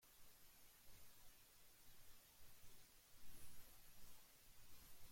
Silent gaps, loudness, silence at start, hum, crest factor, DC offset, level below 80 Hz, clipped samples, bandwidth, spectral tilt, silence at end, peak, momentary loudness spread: none; -67 LUFS; 0 s; none; 14 dB; under 0.1%; -74 dBFS; under 0.1%; 16.5 kHz; -2 dB/octave; 0 s; -44 dBFS; 3 LU